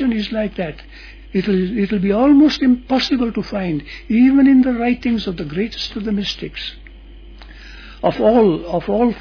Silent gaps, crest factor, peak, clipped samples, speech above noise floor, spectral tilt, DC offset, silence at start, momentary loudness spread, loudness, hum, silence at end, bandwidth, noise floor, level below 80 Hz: none; 14 dB; -2 dBFS; under 0.1%; 22 dB; -7 dB/octave; under 0.1%; 0 s; 14 LU; -17 LUFS; none; 0 s; 5.4 kHz; -38 dBFS; -38 dBFS